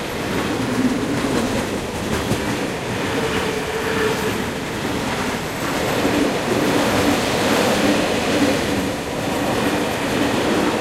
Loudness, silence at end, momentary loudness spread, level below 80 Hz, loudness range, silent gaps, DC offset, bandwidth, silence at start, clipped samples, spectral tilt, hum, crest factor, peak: -20 LUFS; 0 s; 6 LU; -40 dBFS; 4 LU; none; under 0.1%; 16 kHz; 0 s; under 0.1%; -4.5 dB/octave; none; 16 dB; -4 dBFS